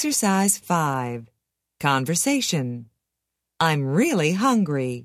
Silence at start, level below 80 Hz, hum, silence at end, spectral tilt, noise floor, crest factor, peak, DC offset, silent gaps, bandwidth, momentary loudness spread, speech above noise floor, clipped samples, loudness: 0 s; -64 dBFS; none; 0 s; -4 dB/octave; -82 dBFS; 18 dB; -4 dBFS; under 0.1%; none; 16 kHz; 9 LU; 60 dB; under 0.1%; -22 LUFS